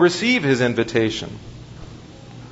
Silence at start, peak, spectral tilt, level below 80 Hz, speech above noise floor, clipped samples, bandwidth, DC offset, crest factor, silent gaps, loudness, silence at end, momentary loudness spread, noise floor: 0 s; -4 dBFS; -5 dB/octave; -48 dBFS; 20 dB; under 0.1%; 8 kHz; under 0.1%; 18 dB; none; -19 LUFS; 0 s; 23 LU; -39 dBFS